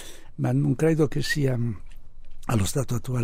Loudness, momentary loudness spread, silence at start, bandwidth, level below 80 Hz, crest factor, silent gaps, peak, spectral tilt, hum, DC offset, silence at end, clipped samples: -25 LUFS; 13 LU; 0 s; 16 kHz; -40 dBFS; 14 dB; none; -10 dBFS; -6 dB/octave; none; under 0.1%; 0 s; under 0.1%